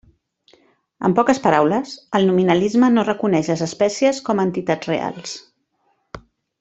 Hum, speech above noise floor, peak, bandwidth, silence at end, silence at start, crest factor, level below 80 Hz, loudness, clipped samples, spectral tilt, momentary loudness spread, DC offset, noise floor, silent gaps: none; 49 dB; -2 dBFS; 8.2 kHz; 0.4 s; 1 s; 18 dB; -56 dBFS; -18 LUFS; under 0.1%; -6 dB/octave; 8 LU; under 0.1%; -66 dBFS; none